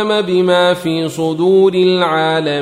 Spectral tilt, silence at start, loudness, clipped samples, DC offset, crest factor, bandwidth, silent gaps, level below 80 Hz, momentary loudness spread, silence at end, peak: -6 dB/octave; 0 s; -13 LUFS; under 0.1%; under 0.1%; 12 dB; 14 kHz; none; -58 dBFS; 6 LU; 0 s; -2 dBFS